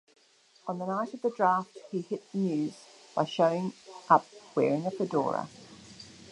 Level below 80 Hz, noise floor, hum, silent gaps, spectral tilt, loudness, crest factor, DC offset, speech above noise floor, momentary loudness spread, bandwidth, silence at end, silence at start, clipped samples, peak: -76 dBFS; -63 dBFS; none; none; -6.5 dB/octave; -30 LUFS; 24 dB; under 0.1%; 34 dB; 23 LU; 11 kHz; 0.05 s; 0.65 s; under 0.1%; -8 dBFS